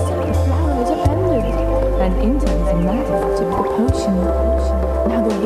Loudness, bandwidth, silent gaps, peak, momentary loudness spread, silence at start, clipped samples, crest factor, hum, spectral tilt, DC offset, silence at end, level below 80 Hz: -18 LUFS; 13.5 kHz; none; -4 dBFS; 1 LU; 0 s; under 0.1%; 12 dB; none; -8 dB/octave; under 0.1%; 0 s; -22 dBFS